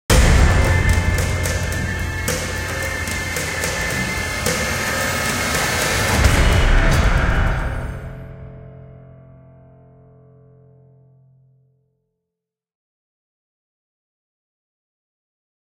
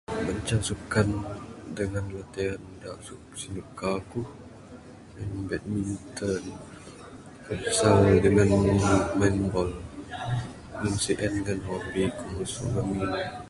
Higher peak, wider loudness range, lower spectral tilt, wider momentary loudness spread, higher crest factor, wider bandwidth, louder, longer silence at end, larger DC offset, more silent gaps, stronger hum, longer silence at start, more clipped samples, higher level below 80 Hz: first, -2 dBFS vs -6 dBFS; second, 9 LU vs 12 LU; second, -4 dB/octave vs -5.5 dB/octave; second, 14 LU vs 21 LU; about the same, 18 dB vs 22 dB; first, 17 kHz vs 11.5 kHz; first, -19 LUFS vs -27 LUFS; first, 6.65 s vs 0 s; neither; neither; neither; about the same, 0.1 s vs 0.1 s; neither; first, -24 dBFS vs -44 dBFS